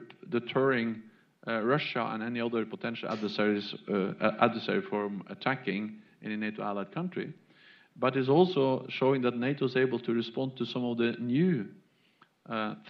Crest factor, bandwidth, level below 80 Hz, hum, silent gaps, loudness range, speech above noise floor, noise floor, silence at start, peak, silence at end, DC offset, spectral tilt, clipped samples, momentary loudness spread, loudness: 22 dB; 6.6 kHz; -82 dBFS; none; none; 4 LU; 35 dB; -65 dBFS; 0 s; -8 dBFS; 0 s; under 0.1%; -8 dB/octave; under 0.1%; 9 LU; -31 LUFS